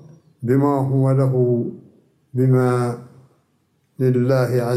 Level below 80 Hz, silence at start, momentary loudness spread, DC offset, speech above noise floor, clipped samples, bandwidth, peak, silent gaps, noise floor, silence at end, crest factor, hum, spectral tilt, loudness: -64 dBFS; 0.4 s; 12 LU; under 0.1%; 47 dB; under 0.1%; 13.5 kHz; -6 dBFS; none; -64 dBFS; 0 s; 14 dB; none; -9 dB/octave; -19 LUFS